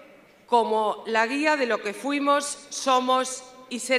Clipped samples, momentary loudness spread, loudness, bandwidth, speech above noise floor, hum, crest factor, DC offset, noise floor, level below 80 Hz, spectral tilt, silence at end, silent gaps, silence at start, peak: under 0.1%; 10 LU; -24 LUFS; 14.5 kHz; 28 dB; none; 18 dB; under 0.1%; -52 dBFS; -76 dBFS; -2 dB/octave; 0 s; none; 0.5 s; -8 dBFS